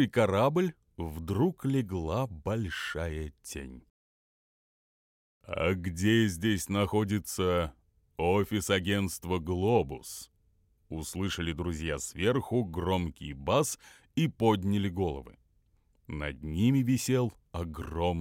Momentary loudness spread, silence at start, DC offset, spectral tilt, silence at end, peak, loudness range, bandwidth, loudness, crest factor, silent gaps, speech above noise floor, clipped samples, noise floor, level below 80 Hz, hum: 13 LU; 0 s; under 0.1%; -5.5 dB/octave; 0 s; -12 dBFS; 6 LU; 16.5 kHz; -31 LUFS; 20 dB; 3.90-5.41 s; 39 dB; under 0.1%; -69 dBFS; -50 dBFS; none